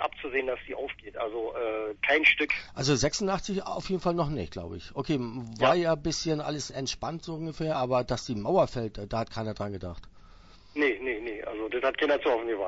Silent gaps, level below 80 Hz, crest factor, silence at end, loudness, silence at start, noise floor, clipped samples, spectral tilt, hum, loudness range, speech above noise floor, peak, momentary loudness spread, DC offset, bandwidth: none; -50 dBFS; 22 dB; 0 s; -29 LUFS; 0 s; -52 dBFS; under 0.1%; -4.5 dB/octave; none; 4 LU; 23 dB; -8 dBFS; 12 LU; under 0.1%; 8 kHz